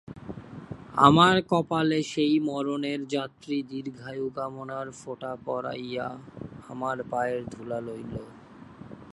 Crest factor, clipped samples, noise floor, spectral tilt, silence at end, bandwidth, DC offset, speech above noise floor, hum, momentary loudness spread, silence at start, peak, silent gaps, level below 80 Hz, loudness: 26 dB; under 0.1%; -47 dBFS; -6 dB/octave; 0 s; 11.5 kHz; under 0.1%; 20 dB; none; 22 LU; 0.05 s; -2 dBFS; none; -60 dBFS; -27 LUFS